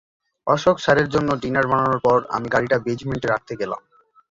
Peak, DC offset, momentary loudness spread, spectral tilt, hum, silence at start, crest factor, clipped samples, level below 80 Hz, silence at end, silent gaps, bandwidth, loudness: -4 dBFS; under 0.1%; 10 LU; -6 dB/octave; none; 0.45 s; 18 dB; under 0.1%; -50 dBFS; 0.5 s; none; 7.8 kHz; -20 LUFS